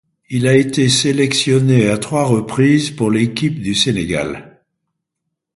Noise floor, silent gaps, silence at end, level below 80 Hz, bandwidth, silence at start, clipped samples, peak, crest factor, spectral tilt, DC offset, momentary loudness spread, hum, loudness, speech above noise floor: -77 dBFS; none; 1.15 s; -46 dBFS; 11.5 kHz; 0.3 s; under 0.1%; 0 dBFS; 16 dB; -5 dB/octave; under 0.1%; 7 LU; none; -15 LUFS; 63 dB